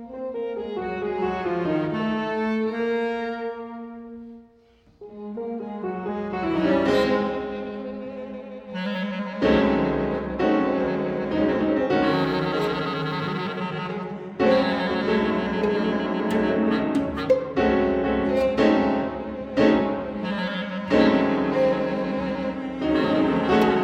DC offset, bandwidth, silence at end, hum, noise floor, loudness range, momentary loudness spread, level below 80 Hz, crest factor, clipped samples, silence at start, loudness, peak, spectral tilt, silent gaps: under 0.1%; 9.6 kHz; 0 s; none; -56 dBFS; 6 LU; 13 LU; -48 dBFS; 18 dB; under 0.1%; 0 s; -24 LUFS; -6 dBFS; -7 dB/octave; none